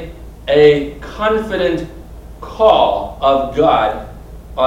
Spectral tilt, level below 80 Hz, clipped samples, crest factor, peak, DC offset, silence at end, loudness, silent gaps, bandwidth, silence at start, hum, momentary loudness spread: -6.5 dB/octave; -34 dBFS; under 0.1%; 16 dB; 0 dBFS; under 0.1%; 0 s; -14 LUFS; none; 12 kHz; 0 s; none; 21 LU